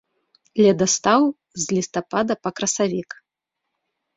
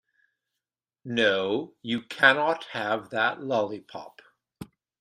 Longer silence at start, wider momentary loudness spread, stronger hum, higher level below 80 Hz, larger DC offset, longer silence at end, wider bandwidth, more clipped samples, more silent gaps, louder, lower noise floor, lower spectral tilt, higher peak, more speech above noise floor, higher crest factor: second, 0.55 s vs 1.05 s; second, 13 LU vs 26 LU; neither; first, -62 dBFS vs -72 dBFS; neither; first, 1.15 s vs 0.35 s; second, 8 kHz vs 14 kHz; neither; neither; first, -21 LUFS vs -25 LUFS; second, -82 dBFS vs -89 dBFS; about the same, -4 dB/octave vs -4.5 dB/octave; about the same, -2 dBFS vs -4 dBFS; about the same, 62 dB vs 62 dB; second, 20 dB vs 26 dB